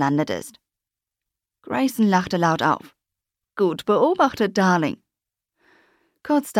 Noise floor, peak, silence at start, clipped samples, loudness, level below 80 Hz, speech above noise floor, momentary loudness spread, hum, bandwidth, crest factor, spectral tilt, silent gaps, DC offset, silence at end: -87 dBFS; -6 dBFS; 0 s; under 0.1%; -21 LUFS; -62 dBFS; 67 dB; 13 LU; none; 16.5 kHz; 18 dB; -6 dB/octave; none; under 0.1%; 0 s